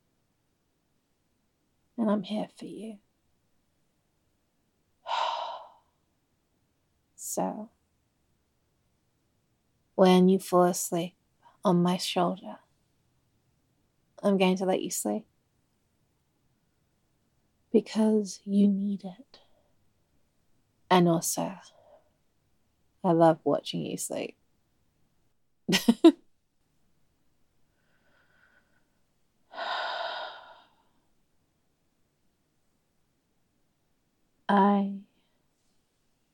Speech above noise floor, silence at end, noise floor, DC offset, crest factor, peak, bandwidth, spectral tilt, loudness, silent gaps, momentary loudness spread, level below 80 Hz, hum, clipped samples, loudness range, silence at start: 49 dB; 1.3 s; -74 dBFS; under 0.1%; 24 dB; -6 dBFS; 17 kHz; -5.5 dB/octave; -27 LUFS; none; 19 LU; -78 dBFS; none; under 0.1%; 12 LU; 2 s